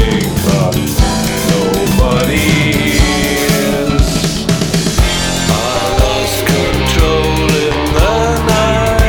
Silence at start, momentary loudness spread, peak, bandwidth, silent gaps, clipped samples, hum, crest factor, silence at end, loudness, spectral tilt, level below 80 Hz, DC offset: 0 s; 2 LU; 0 dBFS; over 20 kHz; none; under 0.1%; none; 12 dB; 0 s; -12 LUFS; -4.5 dB/octave; -18 dBFS; under 0.1%